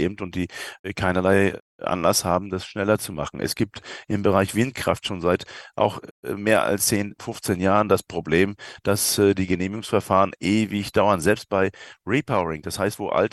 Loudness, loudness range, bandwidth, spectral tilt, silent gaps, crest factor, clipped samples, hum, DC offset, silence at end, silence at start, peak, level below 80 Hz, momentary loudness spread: -23 LUFS; 3 LU; 13 kHz; -4.5 dB/octave; 0.79-0.84 s, 1.60-1.79 s, 6.11-6.23 s; 20 dB; under 0.1%; none; under 0.1%; 0.05 s; 0 s; -2 dBFS; -52 dBFS; 10 LU